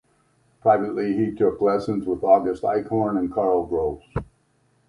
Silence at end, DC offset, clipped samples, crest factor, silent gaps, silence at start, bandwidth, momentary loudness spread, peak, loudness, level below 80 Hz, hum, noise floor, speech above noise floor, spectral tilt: 0.65 s; under 0.1%; under 0.1%; 18 dB; none; 0.65 s; 11 kHz; 7 LU; -4 dBFS; -22 LUFS; -48 dBFS; none; -64 dBFS; 43 dB; -9 dB/octave